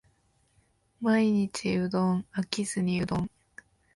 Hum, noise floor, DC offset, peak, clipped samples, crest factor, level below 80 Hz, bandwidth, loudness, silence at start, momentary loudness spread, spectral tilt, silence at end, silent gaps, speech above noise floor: none; -68 dBFS; under 0.1%; -8 dBFS; under 0.1%; 20 dB; -58 dBFS; 11.5 kHz; -28 LUFS; 1 s; 8 LU; -6 dB/octave; 0.7 s; none; 41 dB